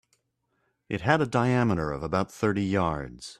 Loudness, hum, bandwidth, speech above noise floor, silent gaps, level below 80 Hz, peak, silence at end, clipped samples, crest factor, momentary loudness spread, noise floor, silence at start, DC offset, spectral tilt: -27 LUFS; none; 13 kHz; 49 dB; none; -52 dBFS; -6 dBFS; 0.05 s; under 0.1%; 22 dB; 7 LU; -75 dBFS; 0.9 s; under 0.1%; -6.5 dB/octave